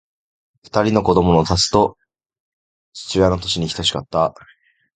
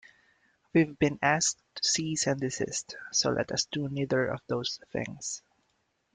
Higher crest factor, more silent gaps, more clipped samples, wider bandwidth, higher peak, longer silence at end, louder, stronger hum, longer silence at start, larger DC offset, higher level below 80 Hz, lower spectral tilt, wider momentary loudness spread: about the same, 20 dB vs 20 dB; first, 2.40-2.92 s vs none; neither; about the same, 9.4 kHz vs 10 kHz; first, 0 dBFS vs -10 dBFS; about the same, 0.65 s vs 0.75 s; first, -17 LUFS vs -29 LUFS; neither; about the same, 0.75 s vs 0.75 s; neither; first, -38 dBFS vs -62 dBFS; first, -5 dB/octave vs -3.5 dB/octave; about the same, 8 LU vs 10 LU